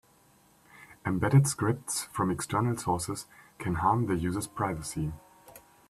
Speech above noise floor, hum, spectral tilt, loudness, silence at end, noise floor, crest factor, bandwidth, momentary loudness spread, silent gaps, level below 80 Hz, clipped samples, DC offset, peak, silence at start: 33 dB; none; -5.5 dB/octave; -30 LUFS; 0.3 s; -62 dBFS; 20 dB; 14 kHz; 14 LU; none; -54 dBFS; under 0.1%; under 0.1%; -10 dBFS; 0.75 s